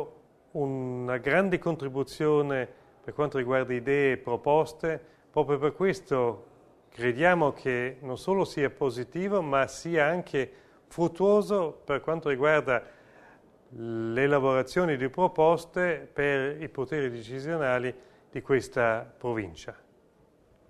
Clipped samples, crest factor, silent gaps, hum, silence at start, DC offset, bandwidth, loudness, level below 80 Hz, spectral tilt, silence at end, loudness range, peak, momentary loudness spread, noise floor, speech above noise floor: under 0.1%; 20 dB; none; none; 0 s; under 0.1%; 13 kHz; -28 LUFS; -60 dBFS; -6.5 dB/octave; 0.95 s; 3 LU; -8 dBFS; 11 LU; -62 dBFS; 35 dB